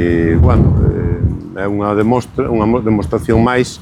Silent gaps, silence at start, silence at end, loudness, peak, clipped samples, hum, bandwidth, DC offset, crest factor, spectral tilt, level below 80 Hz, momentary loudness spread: none; 0 s; 0 s; -14 LUFS; 0 dBFS; under 0.1%; none; 11.5 kHz; under 0.1%; 12 dB; -8 dB/octave; -24 dBFS; 7 LU